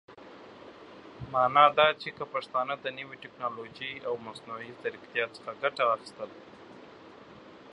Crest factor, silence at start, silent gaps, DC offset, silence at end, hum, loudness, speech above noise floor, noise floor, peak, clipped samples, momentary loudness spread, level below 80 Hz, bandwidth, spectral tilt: 26 dB; 0.1 s; none; under 0.1%; 0 s; none; -29 LUFS; 21 dB; -51 dBFS; -6 dBFS; under 0.1%; 26 LU; -68 dBFS; 11 kHz; -4.5 dB/octave